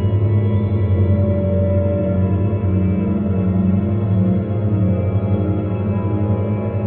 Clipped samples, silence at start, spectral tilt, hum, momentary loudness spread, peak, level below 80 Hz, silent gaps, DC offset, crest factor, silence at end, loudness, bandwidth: under 0.1%; 0 s; -11 dB/octave; none; 3 LU; -6 dBFS; -38 dBFS; none; under 0.1%; 10 dB; 0 s; -18 LUFS; 3.5 kHz